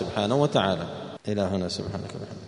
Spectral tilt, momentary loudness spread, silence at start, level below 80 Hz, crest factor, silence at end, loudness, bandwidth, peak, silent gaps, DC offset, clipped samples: -6 dB/octave; 13 LU; 0 s; -56 dBFS; 20 dB; 0 s; -27 LUFS; 10.5 kHz; -6 dBFS; none; under 0.1%; under 0.1%